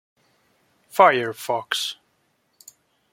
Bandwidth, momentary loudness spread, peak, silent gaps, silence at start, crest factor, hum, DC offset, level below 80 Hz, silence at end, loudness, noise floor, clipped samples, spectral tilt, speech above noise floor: 17 kHz; 13 LU; -2 dBFS; none; 0.95 s; 22 dB; none; under 0.1%; -76 dBFS; 1.2 s; -21 LUFS; -68 dBFS; under 0.1%; -2.5 dB/octave; 48 dB